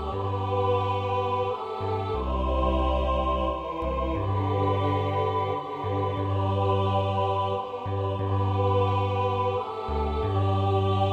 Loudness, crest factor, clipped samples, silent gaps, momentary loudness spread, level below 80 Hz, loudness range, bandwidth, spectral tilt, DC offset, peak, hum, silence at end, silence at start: -27 LUFS; 12 dB; under 0.1%; none; 5 LU; -36 dBFS; 1 LU; 5 kHz; -8.5 dB/octave; under 0.1%; -12 dBFS; none; 0 s; 0 s